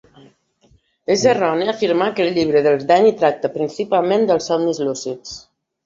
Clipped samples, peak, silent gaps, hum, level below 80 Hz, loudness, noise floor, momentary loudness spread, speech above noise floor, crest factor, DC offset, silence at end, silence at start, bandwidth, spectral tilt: under 0.1%; -2 dBFS; none; none; -58 dBFS; -17 LUFS; -57 dBFS; 13 LU; 40 dB; 16 dB; under 0.1%; 0.45 s; 1.1 s; 7.8 kHz; -4.5 dB/octave